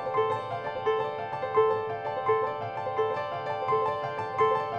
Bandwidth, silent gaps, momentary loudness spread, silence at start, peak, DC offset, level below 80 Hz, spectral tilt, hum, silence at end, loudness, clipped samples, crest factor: 6.8 kHz; none; 7 LU; 0 s; -12 dBFS; under 0.1%; -66 dBFS; -6.5 dB/octave; none; 0 s; -29 LUFS; under 0.1%; 16 dB